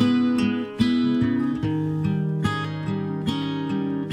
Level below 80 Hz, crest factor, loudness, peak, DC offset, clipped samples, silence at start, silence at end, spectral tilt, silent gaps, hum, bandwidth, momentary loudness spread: -52 dBFS; 14 dB; -24 LUFS; -8 dBFS; under 0.1%; under 0.1%; 0 s; 0 s; -7.5 dB/octave; none; none; 11 kHz; 6 LU